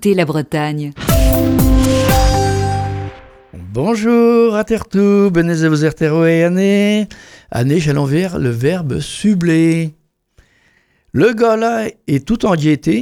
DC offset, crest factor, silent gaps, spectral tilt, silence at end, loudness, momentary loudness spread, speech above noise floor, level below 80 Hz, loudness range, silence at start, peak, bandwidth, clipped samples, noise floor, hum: under 0.1%; 14 dB; none; -6.5 dB/octave; 0 s; -14 LUFS; 8 LU; 42 dB; -24 dBFS; 4 LU; 0 s; 0 dBFS; over 20 kHz; under 0.1%; -56 dBFS; none